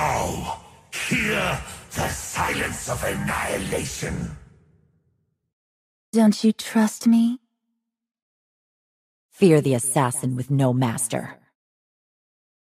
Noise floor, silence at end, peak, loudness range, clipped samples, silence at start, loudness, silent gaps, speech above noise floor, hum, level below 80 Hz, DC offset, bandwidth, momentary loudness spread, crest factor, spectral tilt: -79 dBFS; 1.3 s; -4 dBFS; 5 LU; under 0.1%; 0 s; -23 LUFS; 5.53-6.13 s, 8.22-9.29 s; 57 dB; none; -46 dBFS; under 0.1%; 15.5 kHz; 12 LU; 20 dB; -5 dB/octave